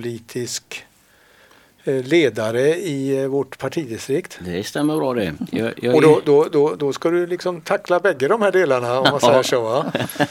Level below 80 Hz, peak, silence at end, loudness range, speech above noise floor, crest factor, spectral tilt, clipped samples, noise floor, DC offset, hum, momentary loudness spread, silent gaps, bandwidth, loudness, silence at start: -60 dBFS; 0 dBFS; 0 s; 5 LU; 35 dB; 18 dB; -5 dB/octave; under 0.1%; -54 dBFS; under 0.1%; none; 12 LU; none; 16.5 kHz; -19 LUFS; 0 s